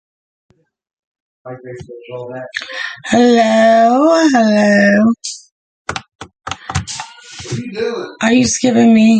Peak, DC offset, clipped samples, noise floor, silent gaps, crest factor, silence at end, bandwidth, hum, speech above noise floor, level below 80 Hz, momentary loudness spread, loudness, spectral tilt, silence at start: 0 dBFS; under 0.1%; under 0.1%; -32 dBFS; 5.52-5.85 s, 6.15-6.19 s; 14 dB; 0 s; 9.2 kHz; none; 20 dB; -44 dBFS; 21 LU; -12 LUFS; -4.5 dB/octave; 1.45 s